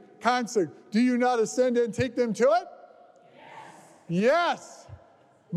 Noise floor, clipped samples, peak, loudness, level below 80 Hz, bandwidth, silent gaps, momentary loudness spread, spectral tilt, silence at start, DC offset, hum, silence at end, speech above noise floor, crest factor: -58 dBFS; under 0.1%; -12 dBFS; -25 LUFS; -66 dBFS; 12.5 kHz; none; 23 LU; -5 dB/octave; 0.2 s; under 0.1%; none; 0 s; 34 dB; 16 dB